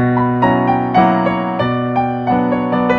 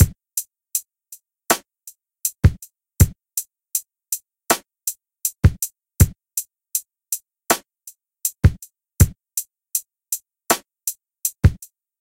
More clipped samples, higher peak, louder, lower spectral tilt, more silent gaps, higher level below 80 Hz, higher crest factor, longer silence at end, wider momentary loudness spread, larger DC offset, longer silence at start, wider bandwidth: neither; about the same, 0 dBFS vs 0 dBFS; first, -15 LUFS vs -22 LUFS; first, -9 dB/octave vs -4.5 dB/octave; neither; second, -44 dBFS vs -30 dBFS; second, 14 dB vs 22 dB; second, 0 s vs 0.45 s; second, 4 LU vs 9 LU; neither; about the same, 0 s vs 0 s; second, 5.6 kHz vs 17 kHz